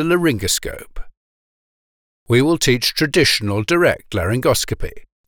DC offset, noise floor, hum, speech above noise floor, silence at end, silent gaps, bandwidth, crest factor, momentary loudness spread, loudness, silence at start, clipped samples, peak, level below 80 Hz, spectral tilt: under 0.1%; under -90 dBFS; none; over 73 dB; 0.25 s; 1.17-2.26 s; over 20 kHz; 16 dB; 11 LU; -17 LUFS; 0 s; under 0.1%; -2 dBFS; -36 dBFS; -4 dB/octave